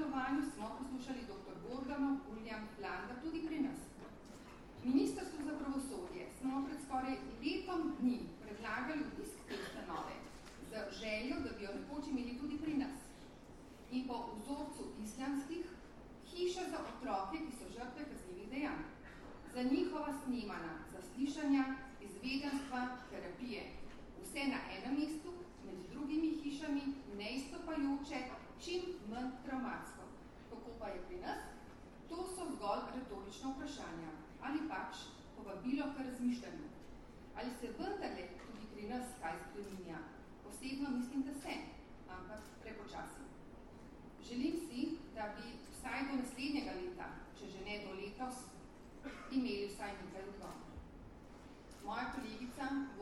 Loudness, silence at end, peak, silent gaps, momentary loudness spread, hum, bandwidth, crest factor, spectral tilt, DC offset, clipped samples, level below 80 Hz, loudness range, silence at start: -44 LUFS; 0 s; -22 dBFS; none; 15 LU; none; 13 kHz; 20 dB; -4.5 dB/octave; under 0.1%; under 0.1%; -62 dBFS; 5 LU; 0 s